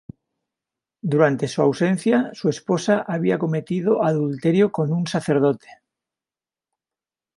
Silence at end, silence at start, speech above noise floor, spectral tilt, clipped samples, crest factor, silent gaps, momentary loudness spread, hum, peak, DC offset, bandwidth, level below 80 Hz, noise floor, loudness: 1.65 s; 1.05 s; over 70 dB; -7 dB/octave; under 0.1%; 20 dB; none; 5 LU; none; -2 dBFS; under 0.1%; 11.5 kHz; -64 dBFS; under -90 dBFS; -21 LUFS